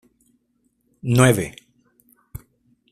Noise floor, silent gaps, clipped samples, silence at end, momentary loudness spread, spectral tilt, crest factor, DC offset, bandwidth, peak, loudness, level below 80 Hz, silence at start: -68 dBFS; none; under 0.1%; 0.55 s; 26 LU; -5.5 dB/octave; 22 dB; under 0.1%; 15 kHz; -2 dBFS; -19 LUFS; -50 dBFS; 1.05 s